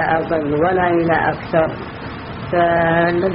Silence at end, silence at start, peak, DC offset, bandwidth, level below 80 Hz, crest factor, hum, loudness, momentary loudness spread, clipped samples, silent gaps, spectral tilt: 0 s; 0 s; -2 dBFS; under 0.1%; 5.6 kHz; -42 dBFS; 16 dB; none; -17 LUFS; 14 LU; under 0.1%; none; -5 dB/octave